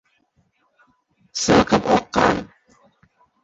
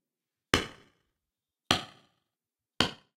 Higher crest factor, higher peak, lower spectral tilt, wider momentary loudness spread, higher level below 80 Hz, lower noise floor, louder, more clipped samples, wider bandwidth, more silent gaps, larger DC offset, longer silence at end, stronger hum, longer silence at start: second, 20 dB vs 28 dB; first, -2 dBFS vs -8 dBFS; first, -4.5 dB/octave vs -3 dB/octave; about the same, 11 LU vs 11 LU; first, -46 dBFS vs -56 dBFS; second, -65 dBFS vs under -90 dBFS; first, -18 LUFS vs -30 LUFS; neither; second, 8.2 kHz vs 16.5 kHz; neither; neither; first, 1 s vs 0.2 s; neither; first, 1.35 s vs 0.55 s